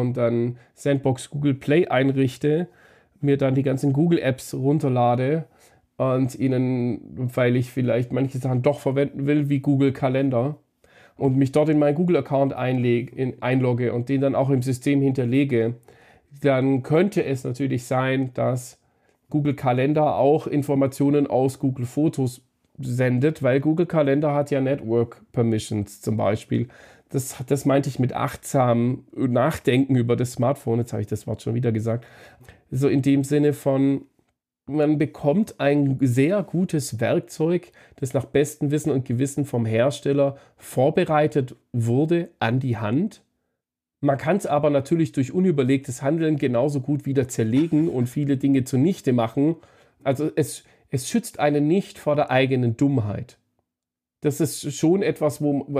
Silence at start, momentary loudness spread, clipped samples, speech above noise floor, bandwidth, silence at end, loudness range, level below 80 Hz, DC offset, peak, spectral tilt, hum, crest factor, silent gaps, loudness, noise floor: 0 s; 8 LU; under 0.1%; 66 dB; 15.5 kHz; 0 s; 2 LU; -60 dBFS; under 0.1%; -6 dBFS; -7 dB/octave; none; 16 dB; none; -22 LUFS; -87 dBFS